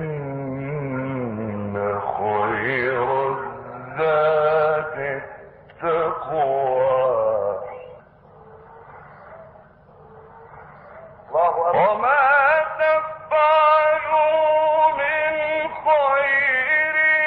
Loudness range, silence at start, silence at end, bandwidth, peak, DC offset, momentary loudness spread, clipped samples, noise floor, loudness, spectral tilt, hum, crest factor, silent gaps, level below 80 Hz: 8 LU; 0 s; 0 s; 4.9 kHz; -6 dBFS; under 0.1%; 12 LU; under 0.1%; -48 dBFS; -20 LUFS; -8 dB/octave; none; 16 dB; none; -58 dBFS